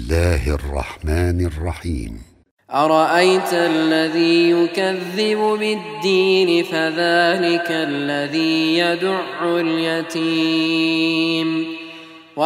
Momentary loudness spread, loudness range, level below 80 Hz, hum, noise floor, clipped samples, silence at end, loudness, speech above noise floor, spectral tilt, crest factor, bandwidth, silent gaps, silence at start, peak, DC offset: 10 LU; 3 LU; -34 dBFS; none; -39 dBFS; under 0.1%; 0 s; -18 LUFS; 21 dB; -5.5 dB/octave; 16 dB; 15.5 kHz; 2.51-2.57 s; 0 s; -2 dBFS; under 0.1%